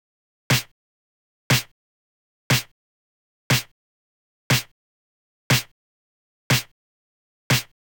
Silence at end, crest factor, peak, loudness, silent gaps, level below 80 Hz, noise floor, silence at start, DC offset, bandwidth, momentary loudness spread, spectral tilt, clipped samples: 0.35 s; 18 dB; -8 dBFS; -22 LUFS; 0.71-1.50 s, 1.71-2.50 s, 2.71-3.50 s, 3.71-4.50 s, 4.71-5.50 s, 5.71-6.50 s, 6.71-7.50 s; -52 dBFS; under -90 dBFS; 0.5 s; under 0.1%; 19.5 kHz; 21 LU; -3.5 dB/octave; under 0.1%